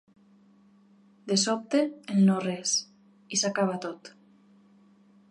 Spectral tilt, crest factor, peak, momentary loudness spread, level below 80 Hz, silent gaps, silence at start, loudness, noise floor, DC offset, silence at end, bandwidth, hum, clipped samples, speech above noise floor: -4 dB/octave; 18 dB; -12 dBFS; 13 LU; -80 dBFS; none; 1.25 s; -27 LUFS; -59 dBFS; under 0.1%; 1.2 s; 11 kHz; none; under 0.1%; 33 dB